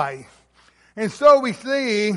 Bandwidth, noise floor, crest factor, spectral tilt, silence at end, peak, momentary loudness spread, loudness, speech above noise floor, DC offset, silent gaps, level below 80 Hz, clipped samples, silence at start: 11.5 kHz; -56 dBFS; 18 dB; -5 dB/octave; 0 s; -2 dBFS; 14 LU; -18 LUFS; 37 dB; under 0.1%; none; -62 dBFS; under 0.1%; 0 s